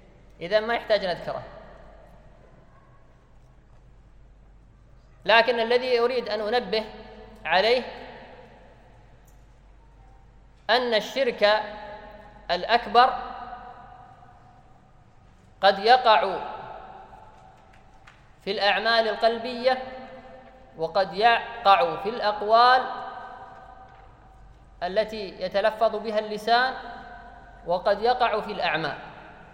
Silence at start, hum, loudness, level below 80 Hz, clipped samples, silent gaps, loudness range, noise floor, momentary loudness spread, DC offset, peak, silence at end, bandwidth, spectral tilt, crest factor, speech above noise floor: 0.4 s; none; -23 LUFS; -54 dBFS; under 0.1%; none; 7 LU; -53 dBFS; 23 LU; under 0.1%; -2 dBFS; 0.2 s; 16 kHz; -4 dB/octave; 24 dB; 31 dB